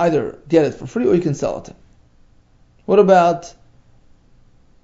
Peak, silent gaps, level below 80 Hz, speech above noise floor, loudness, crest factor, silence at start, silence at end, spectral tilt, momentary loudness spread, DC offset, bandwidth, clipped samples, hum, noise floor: 0 dBFS; none; -50 dBFS; 36 dB; -17 LUFS; 18 dB; 0 s; 1.35 s; -7 dB/octave; 14 LU; under 0.1%; 7.8 kHz; under 0.1%; none; -52 dBFS